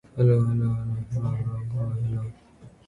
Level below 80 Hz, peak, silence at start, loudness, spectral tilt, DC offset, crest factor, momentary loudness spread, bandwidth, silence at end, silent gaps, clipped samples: -48 dBFS; -10 dBFS; 0.15 s; -26 LUFS; -10.5 dB/octave; under 0.1%; 16 dB; 9 LU; 4.3 kHz; 0.2 s; none; under 0.1%